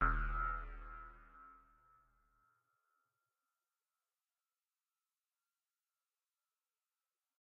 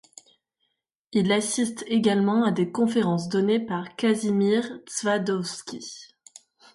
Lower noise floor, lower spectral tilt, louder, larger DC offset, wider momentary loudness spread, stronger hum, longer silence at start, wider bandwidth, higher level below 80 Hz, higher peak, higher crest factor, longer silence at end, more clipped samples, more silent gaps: first, under -90 dBFS vs -77 dBFS; about the same, -5.5 dB/octave vs -5 dB/octave; second, -42 LUFS vs -24 LUFS; neither; first, 22 LU vs 11 LU; neither; second, 0 s vs 1.1 s; second, 3.7 kHz vs 11.5 kHz; first, -50 dBFS vs -68 dBFS; second, -20 dBFS vs -8 dBFS; first, 26 dB vs 16 dB; first, 5.85 s vs 0.7 s; neither; neither